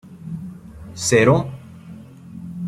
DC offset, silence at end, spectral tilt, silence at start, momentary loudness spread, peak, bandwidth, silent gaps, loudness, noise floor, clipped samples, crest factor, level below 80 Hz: under 0.1%; 0 s; -5 dB/octave; 0.05 s; 25 LU; -2 dBFS; 13 kHz; none; -18 LUFS; -40 dBFS; under 0.1%; 20 dB; -50 dBFS